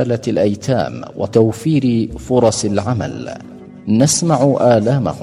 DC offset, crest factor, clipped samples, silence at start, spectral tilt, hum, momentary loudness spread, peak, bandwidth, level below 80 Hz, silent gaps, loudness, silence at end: under 0.1%; 16 dB; under 0.1%; 0 s; -6 dB/octave; none; 13 LU; 0 dBFS; 13 kHz; -44 dBFS; none; -15 LUFS; 0 s